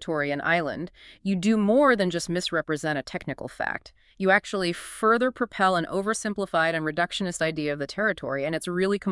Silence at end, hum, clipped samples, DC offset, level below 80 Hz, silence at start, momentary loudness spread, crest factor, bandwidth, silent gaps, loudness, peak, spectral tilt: 0 s; none; under 0.1%; under 0.1%; -58 dBFS; 0 s; 9 LU; 20 dB; 12 kHz; none; -25 LUFS; -6 dBFS; -5 dB/octave